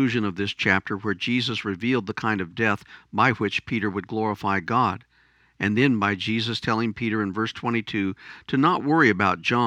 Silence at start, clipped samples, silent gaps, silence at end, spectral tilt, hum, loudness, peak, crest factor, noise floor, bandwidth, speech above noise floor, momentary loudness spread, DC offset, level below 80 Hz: 0 s; under 0.1%; none; 0 s; -6 dB/octave; none; -24 LUFS; -4 dBFS; 20 dB; -61 dBFS; 10.5 kHz; 37 dB; 7 LU; under 0.1%; -60 dBFS